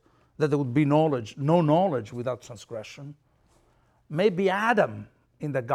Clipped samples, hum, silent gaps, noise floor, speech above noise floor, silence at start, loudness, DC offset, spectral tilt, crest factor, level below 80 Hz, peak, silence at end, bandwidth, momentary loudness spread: under 0.1%; none; none; -64 dBFS; 39 dB; 0.4 s; -25 LUFS; under 0.1%; -7.5 dB/octave; 18 dB; -66 dBFS; -8 dBFS; 0 s; 11.5 kHz; 17 LU